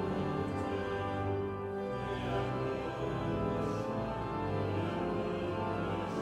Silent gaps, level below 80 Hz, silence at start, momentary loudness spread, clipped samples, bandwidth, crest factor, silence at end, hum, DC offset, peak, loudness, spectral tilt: none; -52 dBFS; 0 s; 2 LU; under 0.1%; 12.5 kHz; 14 dB; 0 s; none; under 0.1%; -22 dBFS; -36 LUFS; -7.5 dB/octave